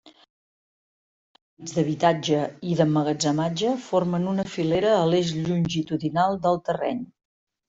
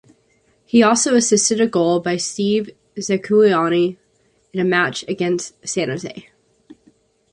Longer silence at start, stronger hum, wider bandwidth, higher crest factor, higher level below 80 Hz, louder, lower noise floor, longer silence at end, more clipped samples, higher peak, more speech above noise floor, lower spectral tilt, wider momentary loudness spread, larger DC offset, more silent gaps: second, 0.05 s vs 0.75 s; neither; second, 8 kHz vs 11.5 kHz; about the same, 18 dB vs 18 dB; about the same, -60 dBFS vs -62 dBFS; second, -24 LUFS vs -17 LUFS; first, under -90 dBFS vs -61 dBFS; second, 0.65 s vs 1.1 s; neither; second, -6 dBFS vs -2 dBFS; first, over 67 dB vs 44 dB; first, -6 dB/octave vs -4 dB/octave; second, 6 LU vs 11 LU; neither; first, 0.30-1.35 s, 1.41-1.57 s vs none